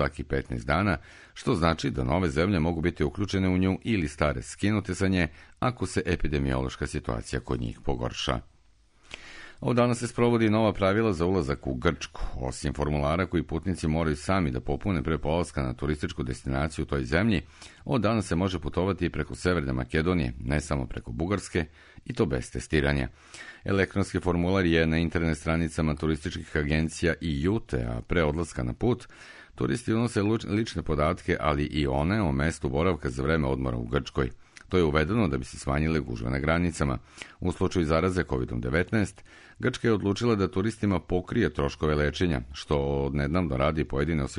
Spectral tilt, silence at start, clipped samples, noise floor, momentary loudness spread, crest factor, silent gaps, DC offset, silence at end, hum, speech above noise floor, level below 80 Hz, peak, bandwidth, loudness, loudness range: -6.5 dB/octave; 0 s; under 0.1%; -60 dBFS; 8 LU; 18 dB; none; under 0.1%; 0 s; none; 33 dB; -40 dBFS; -8 dBFS; 11 kHz; -28 LUFS; 3 LU